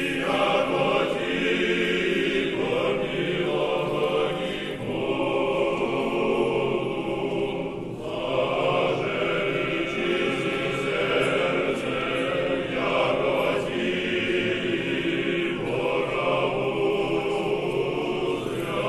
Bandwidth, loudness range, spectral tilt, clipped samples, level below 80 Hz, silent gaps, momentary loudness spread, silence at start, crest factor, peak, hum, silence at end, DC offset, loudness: 13 kHz; 2 LU; -5.5 dB/octave; under 0.1%; -50 dBFS; none; 4 LU; 0 s; 14 dB; -10 dBFS; none; 0 s; under 0.1%; -25 LUFS